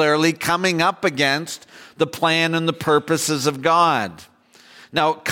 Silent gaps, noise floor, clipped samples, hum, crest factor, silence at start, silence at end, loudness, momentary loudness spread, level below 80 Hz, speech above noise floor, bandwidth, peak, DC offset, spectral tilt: none; -49 dBFS; under 0.1%; none; 16 dB; 0 s; 0 s; -19 LUFS; 8 LU; -62 dBFS; 30 dB; 17 kHz; -6 dBFS; under 0.1%; -4 dB/octave